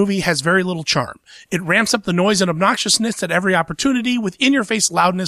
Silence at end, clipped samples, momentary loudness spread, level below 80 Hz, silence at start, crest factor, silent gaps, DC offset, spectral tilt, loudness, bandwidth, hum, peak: 0 s; under 0.1%; 4 LU; -52 dBFS; 0 s; 14 dB; none; under 0.1%; -3.5 dB/octave; -17 LUFS; 15.5 kHz; none; -2 dBFS